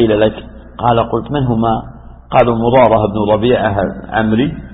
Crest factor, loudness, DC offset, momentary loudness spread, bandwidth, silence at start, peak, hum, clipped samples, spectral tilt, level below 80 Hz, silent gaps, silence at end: 14 dB; -13 LUFS; under 0.1%; 8 LU; 4 kHz; 0 s; 0 dBFS; none; under 0.1%; -10.5 dB/octave; -34 dBFS; none; 0 s